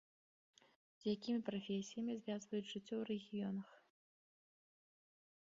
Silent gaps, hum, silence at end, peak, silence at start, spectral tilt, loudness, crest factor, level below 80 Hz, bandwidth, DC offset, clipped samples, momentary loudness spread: none; none; 1.65 s; -28 dBFS; 1 s; -5.5 dB/octave; -45 LUFS; 18 dB; -86 dBFS; 7.4 kHz; under 0.1%; under 0.1%; 5 LU